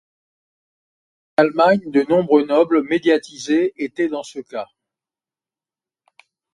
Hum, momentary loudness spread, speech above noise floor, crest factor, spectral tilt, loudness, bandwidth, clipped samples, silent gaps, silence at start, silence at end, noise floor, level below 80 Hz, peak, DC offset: none; 15 LU; over 73 dB; 20 dB; -5.5 dB/octave; -18 LUFS; 11 kHz; under 0.1%; none; 1.4 s; 1.9 s; under -90 dBFS; -64 dBFS; 0 dBFS; under 0.1%